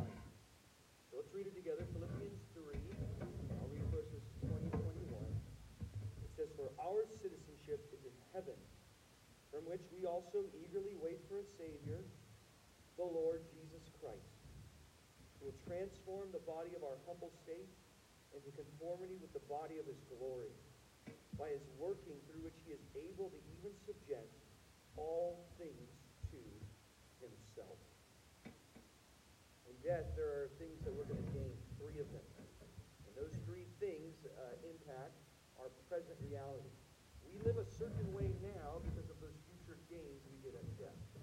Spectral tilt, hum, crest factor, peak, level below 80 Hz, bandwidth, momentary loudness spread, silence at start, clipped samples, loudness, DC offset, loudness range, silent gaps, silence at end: -7 dB/octave; none; 24 dB; -26 dBFS; -62 dBFS; 16 kHz; 20 LU; 0 s; under 0.1%; -49 LUFS; under 0.1%; 5 LU; none; 0 s